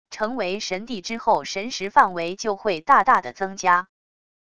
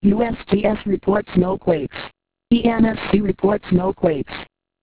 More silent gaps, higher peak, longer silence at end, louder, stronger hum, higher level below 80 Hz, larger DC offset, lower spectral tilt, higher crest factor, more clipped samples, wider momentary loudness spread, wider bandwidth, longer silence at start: neither; about the same, -2 dBFS vs -2 dBFS; first, 0.75 s vs 0.4 s; second, -22 LUFS vs -19 LUFS; neither; second, -60 dBFS vs -42 dBFS; first, 0.5% vs under 0.1%; second, -3 dB/octave vs -11.5 dB/octave; about the same, 20 dB vs 16 dB; neither; about the same, 11 LU vs 12 LU; first, 11 kHz vs 4 kHz; about the same, 0.1 s vs 0.05 s